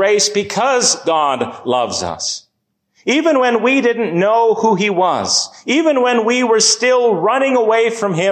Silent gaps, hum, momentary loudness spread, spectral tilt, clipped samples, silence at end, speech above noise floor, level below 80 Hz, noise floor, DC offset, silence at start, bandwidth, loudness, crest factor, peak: none; none; 7 LU; -2.5 dB/octave; under 0.1%; 0 s; 54 dB; -54 dBFS; -68 dBFS; under 0.1%; 0 s; 13.5 kHz; -14 LUFS; 12 dB; -2 dBFS